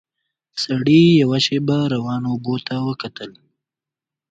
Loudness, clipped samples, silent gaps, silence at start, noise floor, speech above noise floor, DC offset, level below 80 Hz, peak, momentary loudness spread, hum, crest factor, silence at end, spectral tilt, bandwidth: -18 LUFS; under 0.1%; none; 0.55 s; -88 dBFS; 70 dB; under 0.1%; -58 dBFS; -2 dBFS; 18 LU; none; 16 dB; 1 s; -6.5 dB/octave; 9 kHz